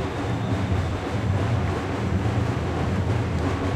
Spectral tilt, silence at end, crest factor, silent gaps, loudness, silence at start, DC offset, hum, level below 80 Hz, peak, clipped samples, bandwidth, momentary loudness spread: -7 dB/octave; 0 s; 12 dB; none; -25 LUFS; 0 s; under 0.1%; none; -40 dBFS; -12 dBFS; under 0.1%; 10.5 kHz; 3 LU